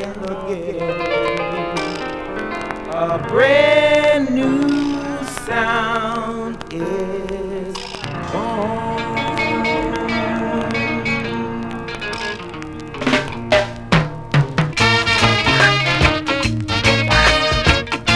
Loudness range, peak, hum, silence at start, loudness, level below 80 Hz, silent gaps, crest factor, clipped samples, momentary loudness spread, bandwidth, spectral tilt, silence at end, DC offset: 8 LU; 0 dBFS; none; 0 s; -18 LUFS; -34 dBFS; none; 18 dB; under 0.1%; 13 LU; 11 kHz; -5 dB/octave; 0 s; under 0.1%